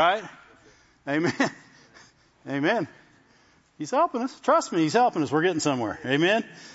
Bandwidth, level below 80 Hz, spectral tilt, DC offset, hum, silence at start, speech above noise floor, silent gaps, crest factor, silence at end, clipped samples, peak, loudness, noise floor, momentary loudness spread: 8 kHz; -70 dBFS; -4.5 dB/octave; under 0.1%; none; 0 s; 36 dB; none; 18 dB; 0 s; under 0.1%; -8 dBFS; -25 LUFS; -60 dBFS; 12 LU